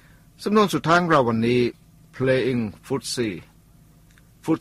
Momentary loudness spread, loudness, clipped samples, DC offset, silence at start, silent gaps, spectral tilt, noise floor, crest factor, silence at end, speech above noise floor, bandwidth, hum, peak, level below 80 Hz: 11 LU; -22 LUFS; under 0.1%; under 0.1%; 0.4 s; none; -5.5 dB/octave; -53 dBFS; 18 dB; 0 s; 32 dB; 15 kHz; none; -6 dBFS; -54 dBFS